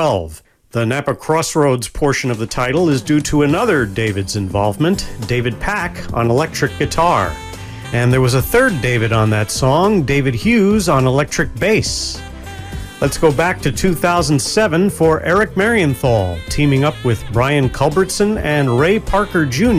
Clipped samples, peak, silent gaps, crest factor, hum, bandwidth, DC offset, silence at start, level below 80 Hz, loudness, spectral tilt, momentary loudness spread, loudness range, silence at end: under 0.1%; 0 dBFS; none; 14 dB; none; 16 kHz; under 0.1%; 0 s; -32 dBFS; -15 LUFS; -5.5 dB/octave; 7 LU; 3 LU; 0 s